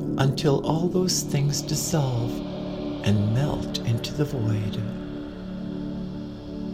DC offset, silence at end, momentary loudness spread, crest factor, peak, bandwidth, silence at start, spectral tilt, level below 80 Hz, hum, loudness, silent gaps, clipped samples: under 0.1%; 0 s; 12 LU; 20 dB; -6 dBFS; 16 kHz; 0 s; -5.5 dB/octave; -44 dBFS; none; -26 LUFS; none; under 0.1%